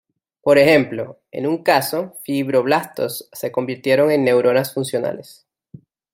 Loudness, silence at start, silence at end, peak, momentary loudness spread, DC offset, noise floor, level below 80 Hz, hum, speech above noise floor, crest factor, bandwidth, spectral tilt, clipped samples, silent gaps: -18 LUFS; 0.45 s; 0.9 s; -2 dBFS; 12 LU; under 0.1%; -45 dBFS; -62 dBFS; none; 27 dB; 18 dB; 16.5 kHz; -5 dB/octave; under 0.1%; none